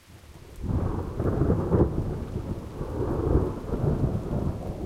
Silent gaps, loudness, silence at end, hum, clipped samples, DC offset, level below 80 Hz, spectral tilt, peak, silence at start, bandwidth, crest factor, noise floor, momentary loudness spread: none; -28 LUFS; 0 s; none; under 0.1%; under 0.1%; -34 dBFS; -9.5 dB/octave; -10 dBFS; 0.1 s; 14.5 kHz; 18 dB; -47 dBFS; 11 LU